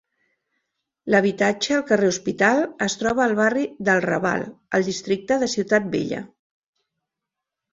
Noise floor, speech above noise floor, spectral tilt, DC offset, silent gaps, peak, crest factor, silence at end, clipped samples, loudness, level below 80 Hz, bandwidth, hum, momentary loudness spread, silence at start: -85 dBFS; 64 dB; -4.5 dB/octave; under 0.1%; none; -2 dBFS; 20 dB; 1.45 s; under 0.1%; -21 LUFS; -60 dBFS; 7.8 kHz; none; 7 LU; 1.05 s